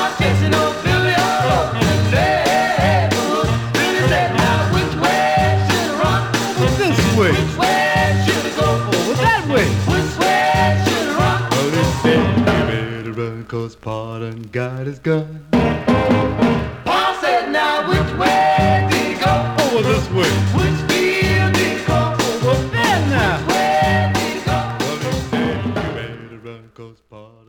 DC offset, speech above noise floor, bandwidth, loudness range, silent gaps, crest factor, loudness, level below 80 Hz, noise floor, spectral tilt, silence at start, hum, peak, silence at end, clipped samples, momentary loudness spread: under 0.1%; 20 dB; 19.5 kHz; 4 LU; none; 14 dB; -16 LUFS; -34 dBFS; -43 dBFS; -5 dB/octave; 0 s; none; -2 dBFS; 0.2 s; under 0.1%; 8 LU